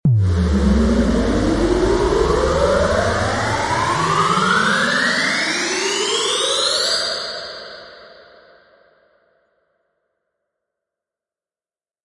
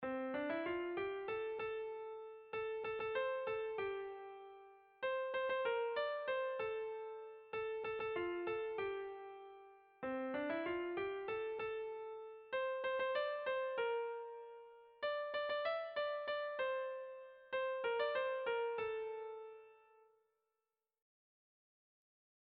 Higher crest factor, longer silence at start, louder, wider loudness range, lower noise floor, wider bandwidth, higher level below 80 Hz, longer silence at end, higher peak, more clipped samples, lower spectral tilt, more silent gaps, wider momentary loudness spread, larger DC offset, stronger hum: about the same, 14 dB vs 16 dB; about the same, 0.05 s vs 0 s; first, -17 LUFS vs -42 LUFS; first, 7 LU vs 3 LU; about the same, under -90 dBFS vs under -90 dBFS; first, 11.5 kHz vs 5 kHz; first, -30 dBFS vs -78 dBFS; first, 3.9 s vs 2.65 s; first, -4 dBFS vs -28 dBFS; neither; first, -4 dB/octave vs -1.5 dB/octave; neither; second, 4 LU vs 13 LU; neither; neither